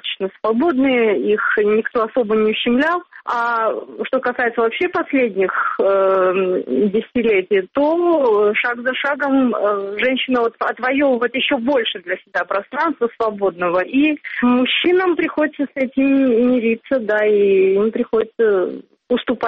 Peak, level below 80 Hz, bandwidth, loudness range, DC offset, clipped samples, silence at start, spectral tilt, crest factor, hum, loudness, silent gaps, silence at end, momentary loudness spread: -6 dBFS; -58 dBFS; 6 kHz; 2 LU; under 0.1%; under 0.1%; 0.05 s; -2.5 dB/octave; 10 dB; none; -17 LUFS; none; 0 s; 6 LU